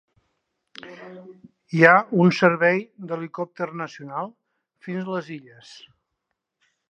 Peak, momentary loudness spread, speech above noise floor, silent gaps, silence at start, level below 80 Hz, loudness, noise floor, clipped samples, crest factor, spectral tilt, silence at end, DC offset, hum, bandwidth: 0 dBFS; 26 LU; 57 dB; none; 0.85 s; -74 dBFS; -21 LUFS; -80 dBFS; under 0.1%; 24 dB; -7 dB/octave; 1.5 s; under 0.1%; none; 8 kHz